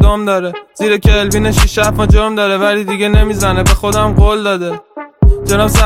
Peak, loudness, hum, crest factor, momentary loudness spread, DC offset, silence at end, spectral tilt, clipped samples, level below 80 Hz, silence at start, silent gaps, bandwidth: 0 dBFS; -12 LUFS; none; 10 dB; 7 LU; under 0.1%; 0 s; -5 dB/octave; under 0.1%; -14 dBFS; 0 s; none; 16 kHz